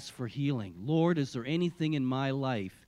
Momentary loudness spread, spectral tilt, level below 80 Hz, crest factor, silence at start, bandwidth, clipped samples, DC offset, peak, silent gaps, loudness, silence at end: 6 LU; -7 dB/octave; -68 dBFS; 16 dB; 0 s; 12 kHz; under 0.1%; under 0.1%; -16 dBFS; none; -32 LUFS; 0.15 s